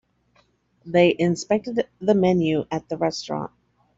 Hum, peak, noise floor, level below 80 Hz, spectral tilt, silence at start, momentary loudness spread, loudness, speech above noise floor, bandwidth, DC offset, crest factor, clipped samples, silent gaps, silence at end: none; -4 dBFS; -63 dBFS; -58 dBFS; -6 dB/octave; 0.85 s; 11 LU; -22 LUFS; 41 dB; 7.8 kHz; under 0.1%; 20 dB; under 0.1%; none; 0.5 s